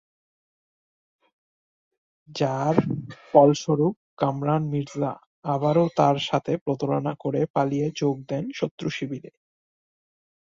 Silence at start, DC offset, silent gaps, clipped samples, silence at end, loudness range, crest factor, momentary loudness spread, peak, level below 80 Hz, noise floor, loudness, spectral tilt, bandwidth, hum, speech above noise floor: 2.3 s; under 0.1%; 3.96-4.17 s, 5.26-5.42 s, 6.61-6.66 s, 7.50-7.54 s, 8.71-8.78 s; under 0.1%; 1.3 s; 5 LU; 24 dB; 11 LU; -2 dBFS; -64 dBFS; under -90 dBFS; -24 LUFS; -7 dB/octave; 7.6 kHz; none; over 67 dB